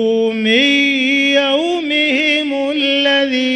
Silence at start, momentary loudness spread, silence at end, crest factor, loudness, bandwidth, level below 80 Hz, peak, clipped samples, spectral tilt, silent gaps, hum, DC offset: 0 s; 5 LU; 0 s; 14 dB; -13 LUFS; 9.4 kHz; -58 dBFS; -2 dBFS; under 0.1%; -3 dB/octave; none; none; under 0.1%